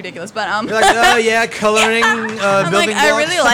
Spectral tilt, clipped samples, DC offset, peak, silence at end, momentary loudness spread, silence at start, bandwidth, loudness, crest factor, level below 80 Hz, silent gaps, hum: -2.5 dB/octave; under 0.1%; under 0.1%; -4 dBFS; 0 s; 8 LU; 0 s; 18 kHz; -13 LUFS; 10 dB; -44 dBFS; none; none